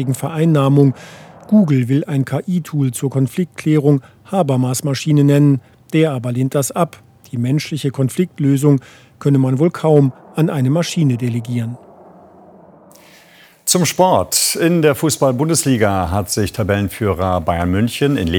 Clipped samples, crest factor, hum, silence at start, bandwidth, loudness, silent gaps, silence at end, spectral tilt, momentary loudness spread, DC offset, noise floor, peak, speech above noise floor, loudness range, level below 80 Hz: under 0.1%; 16 dB; none; 0 s; 19.5 kHz; -16 LUFS; none; 0 s; -5.5 dB/octave; 7 LU; under 0.1%; -46 dBFS; 0 dBFS; 31 dB; 4 LU; -48 dBFS